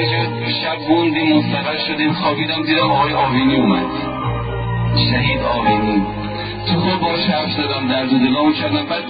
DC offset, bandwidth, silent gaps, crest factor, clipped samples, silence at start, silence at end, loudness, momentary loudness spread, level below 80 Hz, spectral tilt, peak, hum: under 0.1%; 5 kHz; none; 14 dB; under 0.1%; 0 s; 0 s; -17 LUFS; 7 LU; -36 dBFS; -11.5 dB/octave; -2 dBFS; none